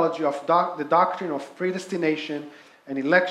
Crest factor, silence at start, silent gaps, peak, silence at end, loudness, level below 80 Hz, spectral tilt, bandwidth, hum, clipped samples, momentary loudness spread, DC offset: 18 dB; 0 s; none; -6 dBFS; 0 s; -24 LUFS; -80 dBFS; -5.5 dB/octave; 12.5 kHz; none; under 0.1%; 12 LU; under 0.1%